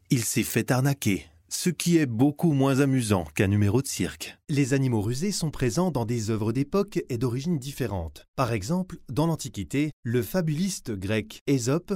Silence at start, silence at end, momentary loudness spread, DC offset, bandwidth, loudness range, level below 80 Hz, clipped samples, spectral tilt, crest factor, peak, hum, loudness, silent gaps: 0.1 s; 0 s; 8 LU; under 0.1%; 16.5 kHz; 4 LU; -50 dBFS; under 0.1%; -5.5 dB/octave; 18 dB; -8 dBFS; none; -26 LUFS; 8.28-8.34 s, 9.93-10.03 s, 11.41-11.46 s